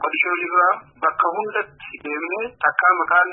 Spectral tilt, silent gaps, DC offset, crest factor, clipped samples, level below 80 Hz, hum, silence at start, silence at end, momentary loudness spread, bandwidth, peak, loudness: -8 dB/octave; none; under 0.1%; 18 dB; under 0.1%; -66 dBFS; none; 0 s; 0 s; 11 LU; 4 kHz; -2 dBFS; -20 LUFS